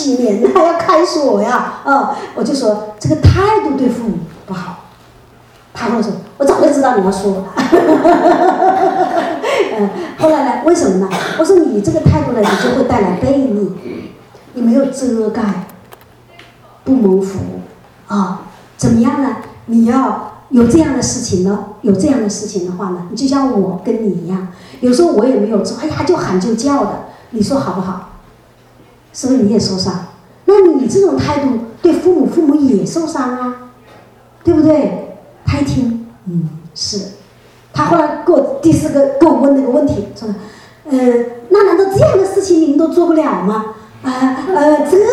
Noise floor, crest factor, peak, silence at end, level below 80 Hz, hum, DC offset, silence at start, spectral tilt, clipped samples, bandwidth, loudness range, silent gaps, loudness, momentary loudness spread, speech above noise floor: -44 dBFS; 12 dB; 0 dBFS; 0 s; -40 dBFS; none; under 0.1%; 0 s; -6 dB/octave; 0.1%; 14 kHz; 5 LU; none; -13 LUFS; 13 LU; 32 dB